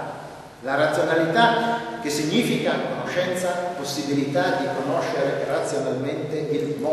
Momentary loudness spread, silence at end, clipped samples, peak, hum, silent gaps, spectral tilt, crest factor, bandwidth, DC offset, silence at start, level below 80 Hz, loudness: 8 LU; 0 s; under 0.1%; -4 dBFS; none; none; -4.5 dB/octave; 18 dB; 12.5 kHz; under 0.1%; 0 s; -62 dBFS; -23 LUFS